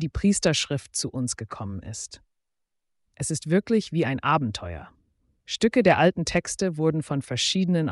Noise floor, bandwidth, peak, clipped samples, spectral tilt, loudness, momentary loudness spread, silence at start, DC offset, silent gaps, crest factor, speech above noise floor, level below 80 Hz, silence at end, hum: -79 dBFS; 11.5 kHz; -8 dBFS; under 0.1%; -4.5 dB/octave; -25 LUFS; 14 LU; 0 s; under 0.1%; none; 16 dB; 55 dB; -48 dBFS; 0 s; none